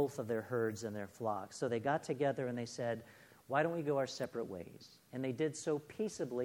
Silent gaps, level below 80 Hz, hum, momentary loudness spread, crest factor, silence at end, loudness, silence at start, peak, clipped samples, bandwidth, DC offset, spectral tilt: none; -78 dBFS; none; 10 LU; 20 dB; 0 s; -39 LUFS; 0 s; -18 dBFS; under 0.1%; 18.5 kHz; under 0.1%; -5.5 dB/octave